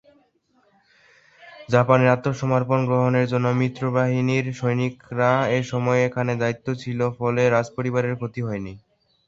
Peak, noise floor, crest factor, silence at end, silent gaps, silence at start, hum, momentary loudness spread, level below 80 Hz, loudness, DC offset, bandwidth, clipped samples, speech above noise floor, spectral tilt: -2 dBFS; -63 dBFS; 20 dB; 0.5 s; none; 1.45 s; none; 9 LU; -58 dBFS; -22 LUFS; under 0.1%; 7.6 kHz; under 0.1%; 42 dB; -7.5 dB/octave